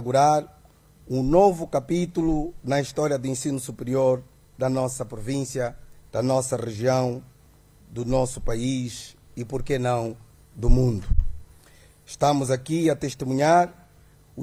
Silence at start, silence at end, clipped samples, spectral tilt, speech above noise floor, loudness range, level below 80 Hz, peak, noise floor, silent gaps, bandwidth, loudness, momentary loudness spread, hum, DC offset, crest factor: 0 s; 0 s; under 0.1%; -6 dB/octave; 31 dB; 4 LU; -34 dBFS; -4 dBFS; -54 dBFS; none; 13.5 kHz; -25 LUFS; 13 LU; none; under 0.1%; 20 dB